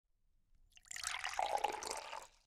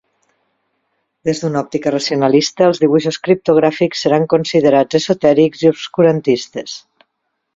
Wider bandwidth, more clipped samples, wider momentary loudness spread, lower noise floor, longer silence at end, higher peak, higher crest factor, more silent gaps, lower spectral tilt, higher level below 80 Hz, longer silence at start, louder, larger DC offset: first, 16 kHz vs 7.8 kHz; neither; about the same, 10 LU vs 8 LU; about the same, -74 dBFS vs -72 dBFS; second, 0.2 s vs 0.8 s; second, -20 dBFS vs 0 dBFS; first, 24 dB vs 14 dB; neither; second, 0.5 dB/octave vs -5.5 dB/octave; second, -70 dBFS vs -56 dBFS; second, 0.6 s vs 1.25 s; second, -41 LUFS vs -14 LUFS; neither